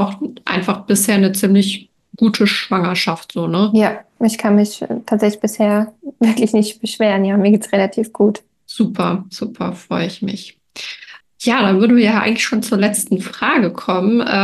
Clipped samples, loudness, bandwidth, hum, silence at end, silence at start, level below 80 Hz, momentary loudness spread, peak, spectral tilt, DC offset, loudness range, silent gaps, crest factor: under 0.1%; -16 LUFS; 12.5 kHz; none; 0 s; 0 s; -60 dBFS; 12 LU; -2 dBFS; -5 dB/octave; under 0.1%; 4 LU; none; 14 dB